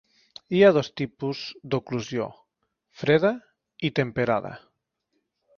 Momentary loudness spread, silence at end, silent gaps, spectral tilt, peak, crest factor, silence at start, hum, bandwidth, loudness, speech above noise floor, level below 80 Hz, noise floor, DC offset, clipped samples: 14 LU; 1 s; none; -6.5 dB/octave; -6 dBFS; 20 dB; 0.5 s; none; 7 kHz; -25 LUFS; 53 dB; -62 dBFS; -77 dBFS; under 0.1%; under 0.1%